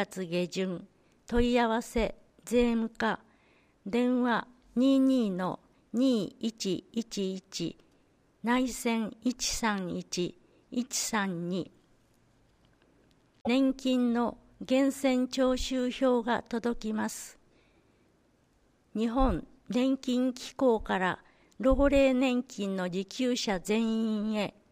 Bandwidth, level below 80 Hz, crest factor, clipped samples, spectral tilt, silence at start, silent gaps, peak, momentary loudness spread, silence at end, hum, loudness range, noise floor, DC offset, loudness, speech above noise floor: 15.5 kHz; -46 dBFS; 18 dB; under 0.1%; -4.5 dB/octave; 0 s; none; -12 dBFS; 11 LU; 0.2 s; none; 6 LU; -68 dBFS; under 0.1%; -30 LUFS; 39 dB